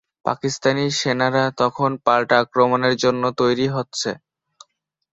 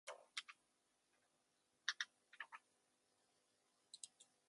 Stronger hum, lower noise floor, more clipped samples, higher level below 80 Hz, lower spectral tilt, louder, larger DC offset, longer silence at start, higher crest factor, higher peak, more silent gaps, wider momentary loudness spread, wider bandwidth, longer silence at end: neither; second, -66 dBFS vs -84 dBFS; neither; first, -60 dBFS vs under -90 dBFS; first, -4.5 dB/octave vs 3 dB/octave; first, -19 LUFS vs -51 LUFS; neither; first, 0.25 s vs 0.05 s; second, 18 dB vs 34 dB; first, -2 dBFS vs -24 dBFS; neither; second, 8 LU vs 17 LU; second, 8.2 kHz vs 11.5 kHz; first, 1 s vs 0.25 s